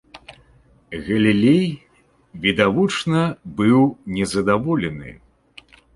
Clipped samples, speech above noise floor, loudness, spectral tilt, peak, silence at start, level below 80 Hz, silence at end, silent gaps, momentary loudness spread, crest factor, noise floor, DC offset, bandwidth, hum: under 0.1%; 35 dB; -19 LUFS; -6 dB/octave; -2 dBFS; 0.15 s; -50 dBFS; 0.8 s; none; 16 LU; 18 dB; -54 dBFS; under 0.1%; 11.5 kHz; none